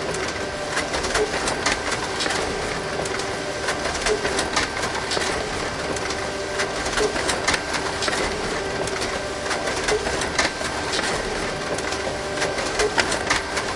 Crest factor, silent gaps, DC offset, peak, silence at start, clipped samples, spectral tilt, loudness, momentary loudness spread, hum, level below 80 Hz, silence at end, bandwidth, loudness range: 22 dB; none; under 0.1%; -2 dBFS; 0 s; under 0.1%; -2.5 dB/octave; -23 LUFS; 4 LU; none; -40 dBFS; 0 s; 11.5 kHz; 1 LU